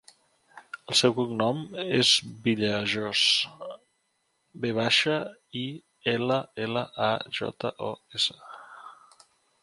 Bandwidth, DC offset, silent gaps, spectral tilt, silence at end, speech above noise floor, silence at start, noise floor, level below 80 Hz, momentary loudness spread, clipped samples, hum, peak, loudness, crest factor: 11.5 kHz; under 0.1%; none; -3.5 dB/octave; 0.7 s; 47 dB; 0.55 s; -74 dBFS; -68 dBFS; 21 LU; under 0.1%; none; -6 dBFS; -26 LUFS; 22 dB